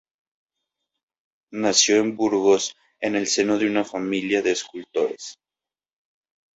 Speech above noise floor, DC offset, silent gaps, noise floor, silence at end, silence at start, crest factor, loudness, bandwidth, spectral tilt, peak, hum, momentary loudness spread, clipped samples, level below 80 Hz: over 68 dB; under 0.1%; none; under -90 dBFS; 1.25 s; 1.5 s; 20 dB; -22 LUFS; 8 kHz; -2.5 dB/octave; -4 dBFS; none; 12 LU; under 0.1%; -66 dBFS